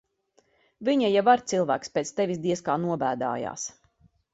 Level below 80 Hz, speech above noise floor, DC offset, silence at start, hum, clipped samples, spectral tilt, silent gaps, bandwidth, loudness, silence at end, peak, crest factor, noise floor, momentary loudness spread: -68 dBFS; 42 dB; under 0.1%; 0.8 s; none; under 0.1%; -5 dB/octave; none; 8 kHz; -26 LUFS; 0.65 s; -6 dBFS; 20 dB; -67 dBFS; 10 LU